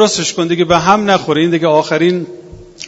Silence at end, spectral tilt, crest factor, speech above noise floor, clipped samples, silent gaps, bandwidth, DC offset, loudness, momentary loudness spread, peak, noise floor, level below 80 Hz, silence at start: 0 s; -4.5 dB/octave; 12 dB; 20 dB; 0.1%; none; 8 kHz; under 0.1%; -12 LUFS; 5 LU; 0 dBFS; -33 dBFS; -46 dBFS; 0 s